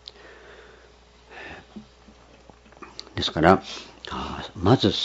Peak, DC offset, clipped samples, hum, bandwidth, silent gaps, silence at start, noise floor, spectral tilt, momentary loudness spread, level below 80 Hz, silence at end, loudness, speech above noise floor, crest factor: 0 dBFS; under 0.1%; under 0.1%; 60 Hz at -55 dBFS; 8 kHz; none; 0.25 s; -53 dBFS; -6 dB/octave; 27 LU; -50 dBFS; 0 s; -23 LUFS; 31 dB; 26 dB